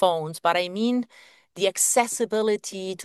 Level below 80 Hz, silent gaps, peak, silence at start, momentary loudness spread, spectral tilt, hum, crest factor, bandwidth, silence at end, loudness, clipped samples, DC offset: -76 dBFS; none; -6 dBFS; 0 s; 8 LU; -2.5 dB/octave; none; 18 dB; 12.5 kHz; 0 s; -24 LUFS; under 0.1%; under 0.1%